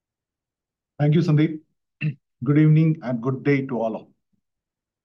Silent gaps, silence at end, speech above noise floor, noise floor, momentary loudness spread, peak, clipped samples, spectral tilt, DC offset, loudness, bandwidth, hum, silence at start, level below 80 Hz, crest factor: none; 1 s; 68 dB; -88 dBFS; 13 LU; -8 dBFS; under 0.1%; -9.5 dB/octave; under 0.1%; -21 LUFS; 6 kHz; none; 1 s; -68 dBFS; 14 dB